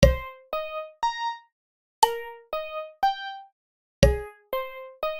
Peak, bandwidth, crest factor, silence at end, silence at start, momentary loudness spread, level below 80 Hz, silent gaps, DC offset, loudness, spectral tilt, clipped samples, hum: -2 dBFS; 16.5 kHz; 26 dB; 0 s; 0 s; 13 LU; -34 dBFS; 1.52-2.02 s, 3.52-4.02 s; under 0.1%; -28 LUFS; -5 dB/octave; under 0.1%; none